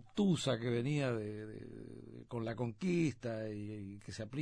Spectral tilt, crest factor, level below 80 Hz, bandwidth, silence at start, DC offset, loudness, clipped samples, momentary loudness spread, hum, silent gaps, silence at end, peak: -6.5 dB/octave; 16 dB; -66 dBFS; 10.5 kHz; 0 s; under 0.1%; -38 LUFS; under 0.1%; 16 LU; none; none; 0 s; -22 dBFS